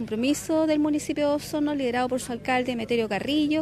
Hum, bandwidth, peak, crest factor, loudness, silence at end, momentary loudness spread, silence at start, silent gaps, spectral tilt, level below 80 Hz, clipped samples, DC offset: none; 15 kHz; -12 dBFS; 14 dB; -25 LUFS; 0 s; 3 LU; 0 s; none; -4.5 dB/octave; -56 dBFS; under 0.1%; under 0.1%